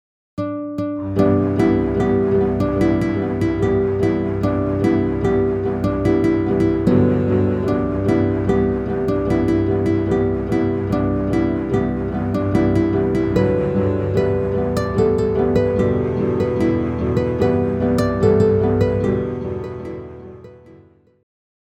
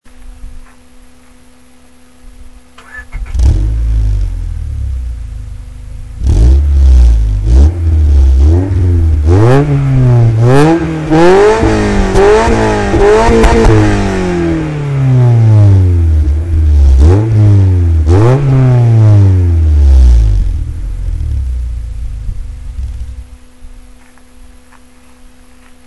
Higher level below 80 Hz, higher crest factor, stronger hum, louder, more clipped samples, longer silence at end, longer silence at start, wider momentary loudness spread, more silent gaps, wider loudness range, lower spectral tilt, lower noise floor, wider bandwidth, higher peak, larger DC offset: second, -34 dBFS vs -12 dBFS; first, 16 dB vs 8 dB; neither; second, -18 LUFS vs -9 LUFS; second, under 0.1% vs 0.6%; first, 1 s vs 0.6 s; first, 0.35 s vs 0.05 s; second, 6 LU vs 17 LU; neither; second, 1 LU vs 13 LU; about the same, -9 dB/octave vs -8 dB/octave; first, -49 dBFS vs -42 dBFS; about the same, 11 kHz vs 11 kHz; about the same, -2 dBFS vs 0 dBFS; neither